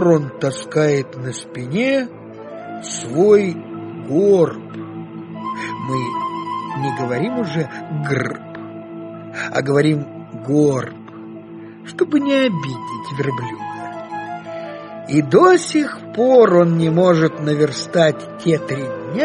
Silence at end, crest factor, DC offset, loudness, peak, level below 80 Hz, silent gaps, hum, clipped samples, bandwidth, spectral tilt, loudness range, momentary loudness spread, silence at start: 0 s; 18 dB; under 0.1%; -18 LUFS; 0 dBFS; -60 dBFS; none; none; under 0.1%; 10 kHz; -6.5 dB/octave; 8 LU; 19 LU; 0 s